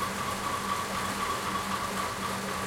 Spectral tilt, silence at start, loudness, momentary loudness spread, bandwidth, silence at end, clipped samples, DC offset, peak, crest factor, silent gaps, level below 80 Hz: -3 dB/octave; 0 s; -31 LUFS; 1 LU; 16.5 kHz; 0 s; under 0.1%; under 0.1%; -18 dBFS; 14 dB; none; -54 dBFS